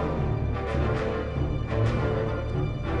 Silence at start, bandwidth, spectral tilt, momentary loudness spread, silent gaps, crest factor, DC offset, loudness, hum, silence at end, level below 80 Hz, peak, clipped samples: 0 s; 7.6 kHz; -8.5 dB/octave; 3 LU; none; 12 dB; under 0.1%; -28 LUFS; none; 0 s; -32 dBFS; -14 dBFS; under 0.1%